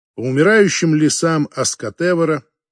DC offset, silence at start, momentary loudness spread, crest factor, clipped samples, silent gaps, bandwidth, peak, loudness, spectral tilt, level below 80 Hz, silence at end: under 0.1%; 0.2 s; 8 LU; 14 dB; under 0.1%; none; 10.5 kHz; -2 dBFS; -16 LUFS; -4.5 dB/octave; -62 dBFS; 0.3 s